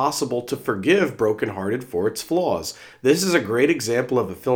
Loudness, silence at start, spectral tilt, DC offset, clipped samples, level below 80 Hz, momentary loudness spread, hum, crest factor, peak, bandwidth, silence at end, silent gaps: -22 LUFS; 0 s; -4.5 dB/octave; under 0.1%; under 0.1%; -62 dBFS; 7 LU; none; 18 dB; -4 dBFS; over 20 kHz; 0 s; none